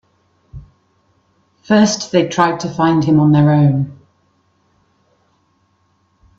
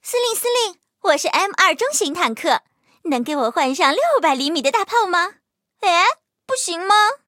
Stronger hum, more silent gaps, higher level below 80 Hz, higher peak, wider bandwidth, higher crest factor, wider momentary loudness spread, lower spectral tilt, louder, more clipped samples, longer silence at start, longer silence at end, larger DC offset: neither; neither; first, -50 dBFS vs -76 dBFS; about the same, 0 dBFS vs 0 dBFS; second, 7.8 kHz vs 16.5 kHz; about the same, 16 dB vs 18 dB; about the same, 6 LU vs 8 LU; first, -6.5 dB/octave vs -0.5 dB/octave; first, -14 LUFS vs -18 LUFS; neither; first, 0.55 s vs 0.05 s; first, 2.45 s vs 0.1 s; neither